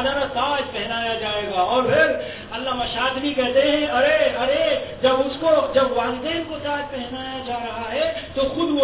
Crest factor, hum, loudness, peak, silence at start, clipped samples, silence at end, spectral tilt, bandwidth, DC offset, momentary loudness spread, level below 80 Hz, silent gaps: 16 dB; none; -21 LUFS; -6 dBFS; 0 s; under 0.1%; 0 s; -8.5 dB/octave; 4 kHz; 0.2%; 10 LU; -46 dBFS; none